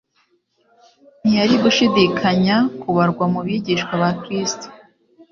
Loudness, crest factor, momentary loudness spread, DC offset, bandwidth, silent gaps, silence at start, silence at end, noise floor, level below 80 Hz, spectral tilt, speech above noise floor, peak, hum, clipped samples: -18 LUFS; 16 dB; 8 LU; under 0.1%; 7.4 kHz; none; 1.25 s; 0.55 s; -63 dBFS; -56 dBFS; -5 dB/octave; 46 dB; -2 dBFS; none; under 0.1%